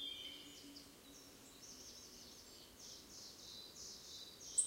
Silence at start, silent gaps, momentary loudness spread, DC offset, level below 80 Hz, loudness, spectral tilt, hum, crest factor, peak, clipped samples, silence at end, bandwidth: 0 s; none; 8 LU; under 0.1%; -76 dBFS; -52 LUFS; 0 dB/octave; none; 30 dB; -22 dBFS; under 0.1%; 0 s; 16 kHz